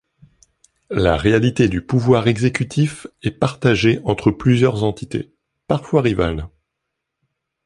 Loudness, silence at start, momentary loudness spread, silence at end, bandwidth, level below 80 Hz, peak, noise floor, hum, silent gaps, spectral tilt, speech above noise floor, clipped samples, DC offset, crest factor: -18 LUFS; 0.9 s; 12 LU; 1.2 s; 11.5 kHz; -38 dBFS; 0 dBFS; -78 dBFS; none; none; -7 dB/octave; 61 dB; under 0.1%; under 0.1%; 18 dB